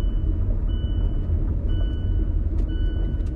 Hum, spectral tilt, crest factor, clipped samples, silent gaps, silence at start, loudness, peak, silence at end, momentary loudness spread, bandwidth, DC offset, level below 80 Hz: none; -9.5 dB/octave; 10 dB; under 0.1%; none; 0 s; -26 LUFS; -12 dBFS; 0 s; 1 LU; 3.2 kHz; under 0.1%; -22 dBFS